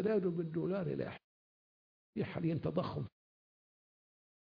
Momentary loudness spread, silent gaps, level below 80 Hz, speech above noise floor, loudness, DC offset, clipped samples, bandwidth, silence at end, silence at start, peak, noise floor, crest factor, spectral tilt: 12 LU; 1.24-2.13 s; -70 dBFS; over 53 dB; -38 LUFS; under 0.1%; under 0.1%; 5.2 kHz; 1.5 s; 0 s; -22 dBFS; under -90 dBFS; 18 dB; -7.5 dB/octave